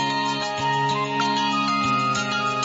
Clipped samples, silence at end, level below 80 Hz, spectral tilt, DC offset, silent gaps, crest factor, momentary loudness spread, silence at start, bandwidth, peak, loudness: under 0.1%; 0 s; -58 dBFS; -3.5 dB/octave; under 0.1%; none; 12 dB; 3 LU; 0 s; 8 kHz; -10 dBFS; -22 LUFS